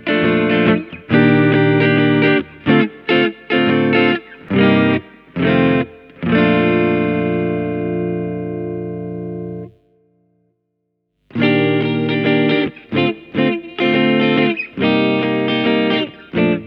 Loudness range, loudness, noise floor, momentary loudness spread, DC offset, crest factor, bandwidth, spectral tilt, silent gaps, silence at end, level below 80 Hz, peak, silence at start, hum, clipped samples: 9 LU; -16 LUFS; -71 dBFS; 11 LU; under 0.1%; 16 dB; 5.6 kHz; -9 dB/octave; none; 0 s; -52 dBFS; 0 dBFS; 0 s; none; under 0.1%